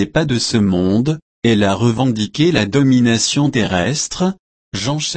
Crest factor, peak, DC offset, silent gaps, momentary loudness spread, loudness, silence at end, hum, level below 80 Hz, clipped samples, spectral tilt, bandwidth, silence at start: 14 dB; -2 dBFS; under 0.1%; 1.22-1.42 s, 4.39-4.72 s; 8 LU; -16 LUFS; 0 s; none; -44 dBFS; under 0.1%; -5 dB/octave; 8.8 kHz; 0 s